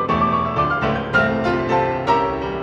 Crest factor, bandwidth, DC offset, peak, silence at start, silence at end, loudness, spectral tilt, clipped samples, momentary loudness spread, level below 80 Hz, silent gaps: 14 dB; 9.4 kHz; under 0.1%; -4 dBFS; 0 s; 0 s; -19 LUFS; -7 dB/octave; under 0.1%; 2 LU; -38 dBFS; none